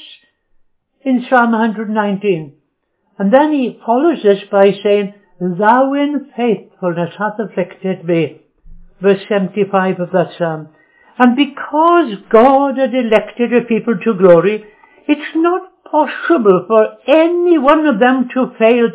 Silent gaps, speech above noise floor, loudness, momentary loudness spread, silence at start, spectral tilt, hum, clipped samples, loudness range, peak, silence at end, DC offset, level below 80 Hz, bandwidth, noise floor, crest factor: none; 53 dB; -13 LUFS; 10 LU; 0.05 s; -10.5 dB/octave; none; 0.1%; 5 LU; 0 dBFS; 0 s; under 0.1%; -54 dBFS; 4 kHz; -65 dBFS; 14 dB